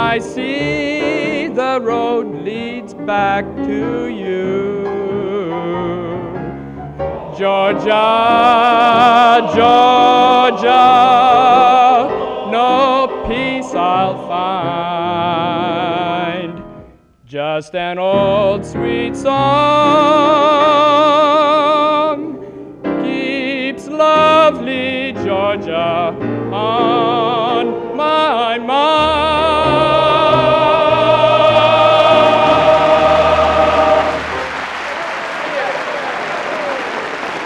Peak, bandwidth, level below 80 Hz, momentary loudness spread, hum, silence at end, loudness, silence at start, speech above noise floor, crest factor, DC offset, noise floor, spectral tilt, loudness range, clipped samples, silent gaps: 0 dBFS; 10 kHz; -42 dBFS; 12 LU; none; 0 s; -13 LUFS; 0 s; 31 dB; 12 dB; under 0.1%; -43 dBFS; -5.5 dB/octave; 9 LU; under 0.1%; none